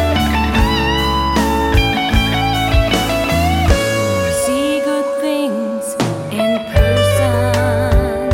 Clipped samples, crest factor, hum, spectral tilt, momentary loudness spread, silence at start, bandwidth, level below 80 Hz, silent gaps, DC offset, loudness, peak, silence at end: under 0.1%; 14 dB; none; -5 dB/octave; 4 LU; 0 s; 16.5 kHz; -22 dBFS; none; under 0.1%; -15 LUFS; 0 dBFS; 0 s